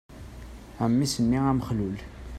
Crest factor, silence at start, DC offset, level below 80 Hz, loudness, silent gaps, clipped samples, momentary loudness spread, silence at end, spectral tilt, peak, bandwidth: 16 dB; 0.1 s; under 0.1%; -44 dBFS; -26 LUFS; none; under 0.1%; 21 LU; 0 s; -6 dB/octave; -12 dBFS; 13.5 kHz